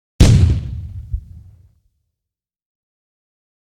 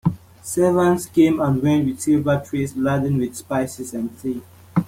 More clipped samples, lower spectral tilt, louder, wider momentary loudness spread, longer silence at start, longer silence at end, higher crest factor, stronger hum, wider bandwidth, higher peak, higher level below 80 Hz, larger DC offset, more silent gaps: neither; about the same, -6.5 dB/octave vs -7 dB/octave; first, -14 LUFS vs -20 LUFS; first, 19 LU vs 11 LU; first, 0.2 s vs 0.05 s; first, 2.6 s vs 0 s; about the same, 18 dB vs 16 dB; neither; second, 13.5 kHz vs 16.5 kHz; first, 0 dBFS vs -4 dBFS; first, -24 dBFS vs -52 dBFS; neither; neither